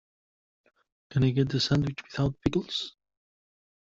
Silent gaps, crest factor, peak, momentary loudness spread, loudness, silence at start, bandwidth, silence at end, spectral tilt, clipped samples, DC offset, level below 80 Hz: none; 20 dB; -10 dBFS; 8 LU; -28 LUFS; 1.1 s; 7.8 kHz; 1.05 s; -6.5 dB/octave; under 0.1%; under 0.1%; -54 dBFS